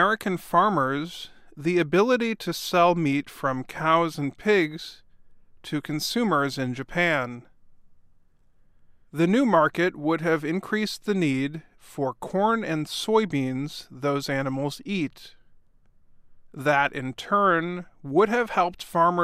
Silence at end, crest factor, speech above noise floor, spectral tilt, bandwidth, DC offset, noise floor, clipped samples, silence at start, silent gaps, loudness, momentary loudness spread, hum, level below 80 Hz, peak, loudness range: 0 s; 20 dB; 33 dB; -5.5 dB/octave; 15.5 kHz; under 0.1%; -57 dBFS; under 0.1%; 0 s; none; -25 LUFS; 12 LU; none; -58 dBFS; -6 dBFS; 5 LU